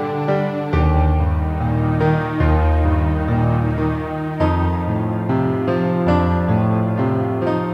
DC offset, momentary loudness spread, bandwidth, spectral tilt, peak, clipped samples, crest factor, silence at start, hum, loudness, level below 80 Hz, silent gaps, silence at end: under 0.1%; 4 LU; 5.4 kHz; -9.5 dB/octave; -2 dBFS; under 0.1%; 14 dB; 0 s; none; -19 LUFS; -24 dBFS; none; 0 s